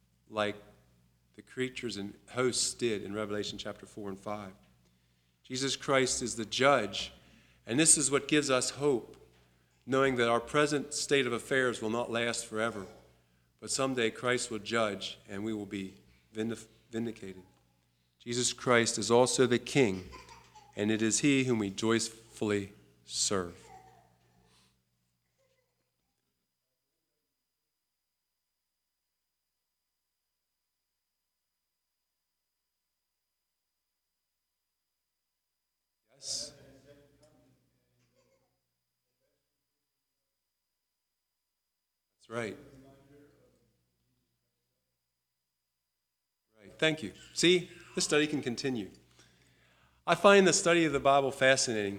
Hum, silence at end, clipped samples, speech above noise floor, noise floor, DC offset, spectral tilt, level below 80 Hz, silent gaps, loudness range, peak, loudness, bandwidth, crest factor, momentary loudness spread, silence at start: none; 0 s; under 0.1%; 56 dB; -86 dBFS; under 0.1%; -3 dB/octave; -68 dBFS; none; 17 LU; -8 dBFS; -30 LUFS; 16 kHz; 26 dB; 16 LU; 0.3 s